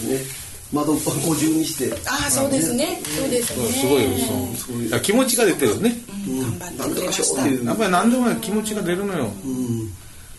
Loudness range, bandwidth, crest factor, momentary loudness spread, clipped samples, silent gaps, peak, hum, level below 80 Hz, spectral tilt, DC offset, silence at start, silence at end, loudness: 1 LU; 12.5 kHz; 16 dB; 9 LU; under 0.1%; none; -4 dBFS; none; -48 dBFS; -4 dB/octave; under 0.1%; 0 s; 0 s; -21 LUFS